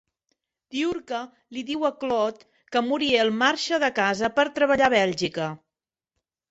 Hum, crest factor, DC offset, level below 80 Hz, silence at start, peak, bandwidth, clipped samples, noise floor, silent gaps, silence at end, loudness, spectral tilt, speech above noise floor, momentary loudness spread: none; 20 dB; under 0.1%; -62 dBFS; 0.7 s; -6 dBFS; 8.2 kHz; under 0.1%; -89 dBFS; none; 0.95 s; -24 LUFS; -4 dB/octave; 65 dB; 13 LU